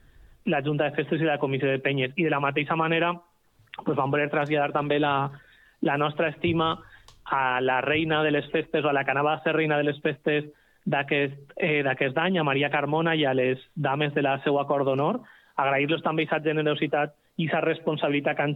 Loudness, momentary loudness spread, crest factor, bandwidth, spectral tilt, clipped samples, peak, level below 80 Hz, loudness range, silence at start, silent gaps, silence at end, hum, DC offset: -25 LUFS; 5 LU; 16 dB; 5 kHz; -8.5 dB/octave; under 0.1%; -10 dBFS; -62 dBFS; 2 LU; 0.45 s; none; 0 s; none; under 0.1%